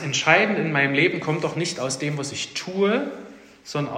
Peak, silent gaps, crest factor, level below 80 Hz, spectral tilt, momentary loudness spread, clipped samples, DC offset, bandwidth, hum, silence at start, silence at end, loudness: -2 dBFS; none; 22 dB; -66 dBFS; -4 dB/octave; 11 LU; under 0.1%; under 0.1%; 15 kHz; none; 0 s; 0 s; -22 LUFS